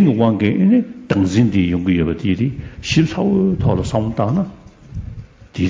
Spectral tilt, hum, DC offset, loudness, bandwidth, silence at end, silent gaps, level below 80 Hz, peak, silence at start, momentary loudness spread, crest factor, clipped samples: -7.5 dB/octave; none; under 0.1%; -17 LUFS; 7.8 kHz; 0 s; none; -34 dBFS; -2 dBFS; 0 s; 17 LU; 14 dB; under 0.1%